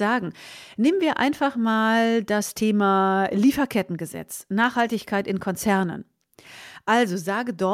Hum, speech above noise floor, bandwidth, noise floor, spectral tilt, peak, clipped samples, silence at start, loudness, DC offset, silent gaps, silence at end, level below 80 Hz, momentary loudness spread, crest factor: none; 25 dB; 16 kHz; -48 dBFS; -5 dB/octave; -8 dBFS; under 0.1%; 0 s; -23 LUFS; under 0.1%; none; 0 s; -60 dBFS; 13 LU; 16 dB